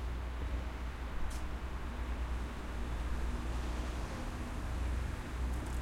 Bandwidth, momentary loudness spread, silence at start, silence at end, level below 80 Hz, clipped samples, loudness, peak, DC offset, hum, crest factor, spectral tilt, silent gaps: 14 kHz; 4 LU; 0 s; 0 s; -38 dBFS; under 0.1%; -41 LUFS; -26 dBFS; under 0.1%; none; 12 dB; -6 dB/octave; none